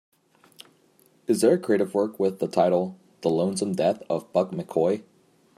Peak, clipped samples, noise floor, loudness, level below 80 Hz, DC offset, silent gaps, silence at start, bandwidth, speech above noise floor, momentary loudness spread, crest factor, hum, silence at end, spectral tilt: -8 dBFS; under 0.1%; -61 dBFS; -25 LUFS; -74 dBFS; under 0.1%; none; 1.3 s; 14.5 kHz; 37 dB; 8 LU; 18 dB; none; 0.55 s; -6 dB/octave